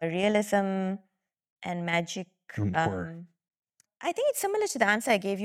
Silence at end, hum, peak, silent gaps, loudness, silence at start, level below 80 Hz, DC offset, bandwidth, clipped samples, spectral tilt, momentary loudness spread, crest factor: 0 s; none; -10 dBFS; 1.50-1.56 s, 3.59-3.63 s; -28 LUFS; 0 s; -66 dBFS; under 0.1%; 16.5 kHz; under 0.1%; -4.5 dB/octave; 15 LU; 20 dB